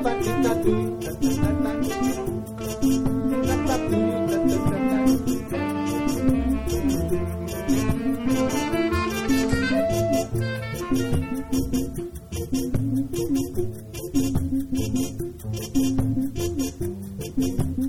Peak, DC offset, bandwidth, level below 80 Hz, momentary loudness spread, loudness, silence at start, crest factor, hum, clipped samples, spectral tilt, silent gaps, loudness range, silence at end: -8 dBFS; under 0.1%; 17 kHz; -36 dBFS; 8 LU; -25 LUFS; 0 s; 16 dB; none; under 0.1%; -6 dB/octave; none; 3 LU; 0 s